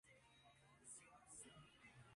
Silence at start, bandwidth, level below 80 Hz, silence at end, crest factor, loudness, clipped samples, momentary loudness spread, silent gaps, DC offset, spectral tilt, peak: 0.05 s; 11.5 kHz; -84 dBFS; 0 s; 20 dB; -62 LUFS; under 0.1%; 6 LU; none; under 0.1%; -2.5 dB/octave; -46 dBFS